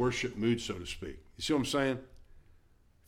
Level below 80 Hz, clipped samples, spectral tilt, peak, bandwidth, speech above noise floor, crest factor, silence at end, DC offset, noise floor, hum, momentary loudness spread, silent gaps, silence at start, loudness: -54 dBFS; under 0.1%; -5 dB/octave; -18 dBFS; 17 kHz; 31 dB; 16 dB; 0.7 s; under 0.1%; -64 dBFS; none; 11 LU; none; 0 s; -33 LUFS